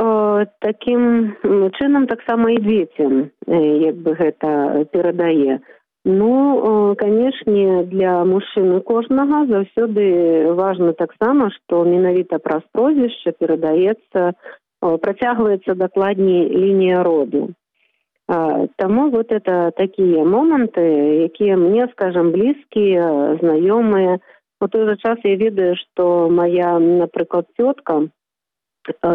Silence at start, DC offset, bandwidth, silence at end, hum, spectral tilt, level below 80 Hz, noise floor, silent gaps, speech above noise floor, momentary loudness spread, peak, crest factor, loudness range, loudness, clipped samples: 0 s; under 0.1%; 3.9 kHz; 0 s; none; -10 dB/octave; -58 dBFS; -86 dBFS; none; 70 dB; 6 LU; -6 dBFS; 10 dB; 2 LU; -16 LUFS; under 0.1%